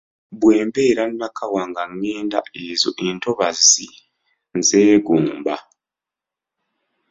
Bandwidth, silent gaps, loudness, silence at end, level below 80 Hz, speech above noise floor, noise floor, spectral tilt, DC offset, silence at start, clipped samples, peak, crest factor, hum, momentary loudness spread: 8 kHz; none; -18 LUFS; 1.5 s; -60 dBFS; 70 dB; -88 dBFS; -2.5 dB/octave; under 0.1%; 0.3 s; under 0.1%; 0 dBFS; 20 dB; none; 13 LU